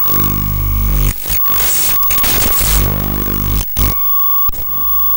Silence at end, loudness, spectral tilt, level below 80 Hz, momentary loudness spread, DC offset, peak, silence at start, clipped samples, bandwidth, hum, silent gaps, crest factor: 0 s; -11 LUFS; -3.5 dB/octave; -20 dBFS; 6 LU; under 0.1%; 0 dBFS; 0 s; under 0.1%; 19 kHz; none; none; 12 dB